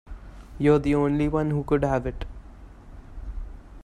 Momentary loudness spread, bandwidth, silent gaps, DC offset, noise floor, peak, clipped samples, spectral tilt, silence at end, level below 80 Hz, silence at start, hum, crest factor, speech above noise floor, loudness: 24 LU; 10.5 kHz; none; under 0.1%; -45 dBFS; -6 dBFS; under 0.1%; -8.5 dB/octave; 0 s; -38 dBFS; 0.05 s; none; 20 dB; 22 dB; -24 LUFS